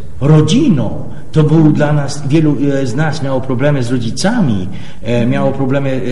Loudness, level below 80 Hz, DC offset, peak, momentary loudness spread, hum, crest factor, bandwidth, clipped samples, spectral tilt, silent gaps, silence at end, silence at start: -13 LUFS; -36 dBFS; 10%; 0 dBFS; 9 LU; none; 14 dB; 11.5 kHz; under 0.1%; -7 dB/octave; none; 0 s; 0 s